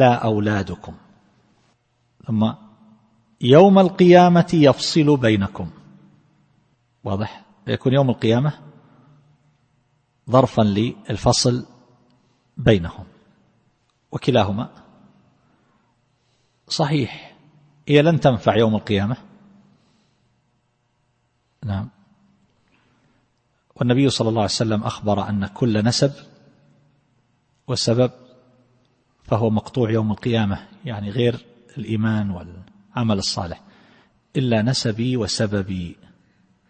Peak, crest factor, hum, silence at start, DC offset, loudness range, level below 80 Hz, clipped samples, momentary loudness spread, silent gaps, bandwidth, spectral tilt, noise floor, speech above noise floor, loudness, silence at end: 0 dBFS; 20 dB; none; 0 s; under 0.1%; 12 LU; -50 dBFS; under 0.1%; 19 LU; none; 8.8 kHz; -6 dB/octave; -67 dBFS; 49 dB; -19 LUFS; 0.75 s